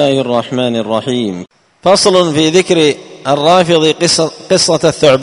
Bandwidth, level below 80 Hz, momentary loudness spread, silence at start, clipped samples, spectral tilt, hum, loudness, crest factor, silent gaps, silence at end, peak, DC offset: 11 kHz; -48 dBFS; 8 LU; 0 s; 0.3%; -4 dB/octave; none; -11 LUFS; 12 dB; none; 0 s; 0 dBFS; under 0.1%